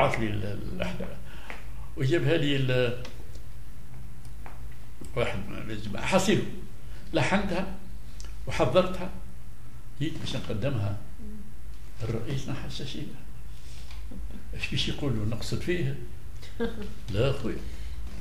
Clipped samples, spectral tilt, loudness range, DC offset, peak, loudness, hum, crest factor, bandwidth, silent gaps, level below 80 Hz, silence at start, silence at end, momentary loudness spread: under 0.1%; -5.5 dB/octave; 6 LU; 4%; -8 dBFS; -30 LUFS; none; 22 dB; 15.5 kHz; none; -42 dBFS; 0 s; 0 s; 20 LU